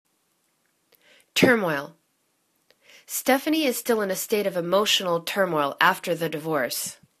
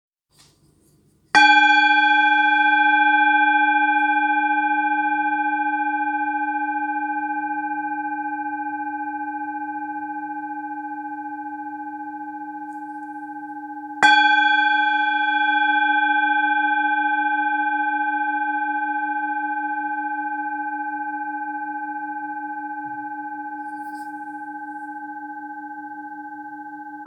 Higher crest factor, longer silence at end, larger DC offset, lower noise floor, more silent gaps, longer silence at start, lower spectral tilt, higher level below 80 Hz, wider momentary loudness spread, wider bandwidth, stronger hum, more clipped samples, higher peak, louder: about the same, 24 dB vs 22 dB; first, 0.25 s vs 0 s; neither; first, -70 dBFS vs -58 dBFS; neither; about the same, 1.35 s vs 1.35 s; first, -3 dB/octave vs -1.5 dB/octave; first, -70 dBFS vs -76 dBFS; second, 8 LU vs 18 LU; first, 14 kHz vs 10 kHz; neither; neither; about the same, -2 dBFS vs 0 dBFS; second, -23 LUFS vs -20 LUFS